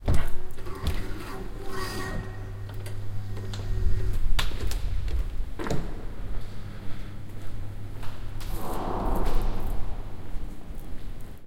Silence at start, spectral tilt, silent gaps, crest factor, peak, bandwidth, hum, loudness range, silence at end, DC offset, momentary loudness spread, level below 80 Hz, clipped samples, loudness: 0 s; -5.5 dB/octave; none; 16 dB; -8 dBFS; 15 kHz; none; 5 LU; 0 s; under 0.1%; 11 LU; -30 dBFS; under 0.1%; -35 LUFS